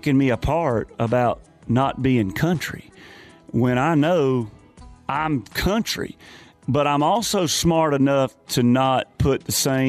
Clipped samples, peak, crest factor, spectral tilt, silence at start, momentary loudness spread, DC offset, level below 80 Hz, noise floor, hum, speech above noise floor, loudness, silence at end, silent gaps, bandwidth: under 0.1%; -8 dBFS; 12 dB; -5 dB/octave; 0.05 s; 9 LU; under 0.1%; -42 dBFS; -45 dBFS; none; 25 dB; -21 LUFS; 0 s; none; 15.5 kHz